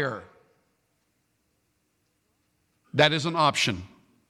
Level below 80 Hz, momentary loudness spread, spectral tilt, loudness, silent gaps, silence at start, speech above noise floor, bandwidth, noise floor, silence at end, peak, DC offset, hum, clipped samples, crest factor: -64 dBFS; 14 LU; -4 dB/octave; -24 LUFS; none; 0 s; 49 dB; 14.5 kHz; -73 dBFS; 0.45 s; -4 dBFS; under 0.1%; none; under 0.1%; 24 dB